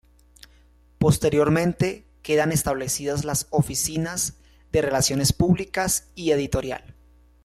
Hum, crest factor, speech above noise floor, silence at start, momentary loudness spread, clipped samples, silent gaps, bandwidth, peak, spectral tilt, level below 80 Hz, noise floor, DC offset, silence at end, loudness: 60 Hz at -50 dBFS; 16 dB; 33 dB; 1 s; 7 LU; under 0.1%; none; 15.5 kHz; -8 dBFS; -4.5 dB/octave; -44 dBFS; -55 dBFS; under 0.1%; 0.55 s; -23 LUFS